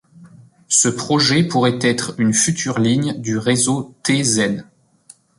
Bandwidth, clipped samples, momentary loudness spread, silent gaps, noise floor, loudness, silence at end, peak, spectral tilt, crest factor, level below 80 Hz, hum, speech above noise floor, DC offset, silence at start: 11.5 kHz; under 0.1%; 6 LU; none; -49 dBFS; -17 LUFS; 0.75 s; -2 dBFS; -3.5 dB/octave; 16 dB; -54 dBFS; none; 32 dB; under 0.1%; 0.2 s